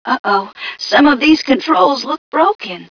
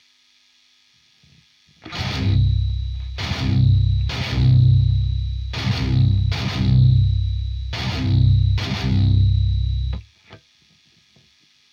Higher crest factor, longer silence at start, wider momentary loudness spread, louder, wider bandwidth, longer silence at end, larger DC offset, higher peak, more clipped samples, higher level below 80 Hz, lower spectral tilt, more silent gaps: about the same, 14 dB vs 14 dB; second, 0.05 s vs 1.85 s; about the same, 11 LU vs 11 LU; first, -13 LUFS vs -20 LUFS; second, 5.4 kHz vs 7 kHz; second, 0.05 s vs 1.35 s; neither; first, 0 dBFS vs -6 dBFS; neither; second, -52 dBFS vs -26 dBFS; second, -4 dB/octave vs -7 dB/octave; first, 0.19-0.24 s, 2.18-2.32 s, 2.55-2.59 s vs none